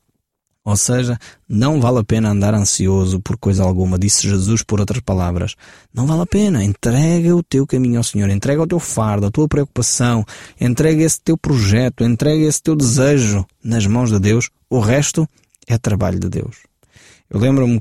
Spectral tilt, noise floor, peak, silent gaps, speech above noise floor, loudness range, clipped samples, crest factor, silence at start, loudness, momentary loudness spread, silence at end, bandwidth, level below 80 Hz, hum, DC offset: -5.5 dB/octave; -71 dBFS; -2 dBFS; none; 56 dB; 2 LU; under 0.1%; 14 dB; 0.65 s; -16 LUFS; 7 LU; 0 s; 15.5 kHz; -38 dBFS; none; under 0.1%